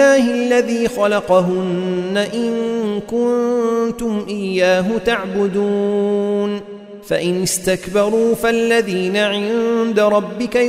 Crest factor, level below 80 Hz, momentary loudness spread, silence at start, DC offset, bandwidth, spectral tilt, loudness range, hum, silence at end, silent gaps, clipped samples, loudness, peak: 14 dB; -48 dBFS; 6 LU; 0 s; under 0.1%; 16 kHz; -5 dB/octave; 2 LU; none; 0 s; none; under 0.1%; -17 LUFS; -2 dBFS